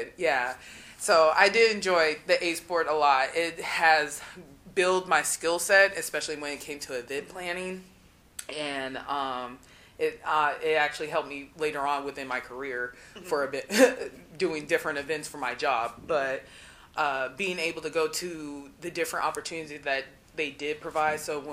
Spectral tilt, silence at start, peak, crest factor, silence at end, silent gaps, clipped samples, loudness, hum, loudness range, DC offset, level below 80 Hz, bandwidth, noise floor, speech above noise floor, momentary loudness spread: -2.5 dB/octave; 0 s; -4 dBFS; 24 dB; 0 s; none; under 0.1%; -27 LUFS; none; 8 LU; under 0.1%; -62 dBFS; 15.5 kHz; -47 dBFS; 19 dB; 15 LU